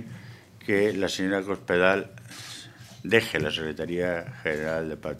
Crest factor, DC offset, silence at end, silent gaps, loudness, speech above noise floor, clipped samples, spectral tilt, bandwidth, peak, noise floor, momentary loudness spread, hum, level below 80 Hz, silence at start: 24 dB; under 0.1%; 0 s; none; -26 LUFS; 20 dB; under 0.1%; -5 dB/octave; 15 kHz; -4 dBFS; -46 dBFS; 18 LU; none; -56 dBFS; 0 s